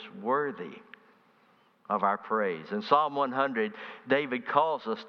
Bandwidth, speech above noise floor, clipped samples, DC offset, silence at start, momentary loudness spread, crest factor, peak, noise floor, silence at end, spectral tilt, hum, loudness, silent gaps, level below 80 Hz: 6.4 kHz; 35 dB; under 0.1%; under 0.1%; 0 s; 11 LU; 22 dB; -8 dBFS; -64 dBFS; 0 s; -7 dB/octave; none; -29 LUFS; none; -84 dBFS